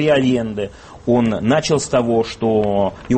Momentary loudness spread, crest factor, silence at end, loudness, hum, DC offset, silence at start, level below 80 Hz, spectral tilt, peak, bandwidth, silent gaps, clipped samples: 9 LU; 14 dB; 0 s; -17 LUFS; none; under 0.1%; 0 s; -44 dBFS; -5.5 dB/octave; -4 dBFS; 8.8 kHz; none; under 0.1%